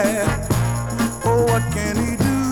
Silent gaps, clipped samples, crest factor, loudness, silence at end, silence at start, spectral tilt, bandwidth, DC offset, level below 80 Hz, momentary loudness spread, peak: none; under 0.1%; 14 dB; -20 LUFS; 0 s; 0 s; -5.5 dB/octave; 19.5 kHz; under 0.1%; -32 dBFS; 4 LU; -4 dBFS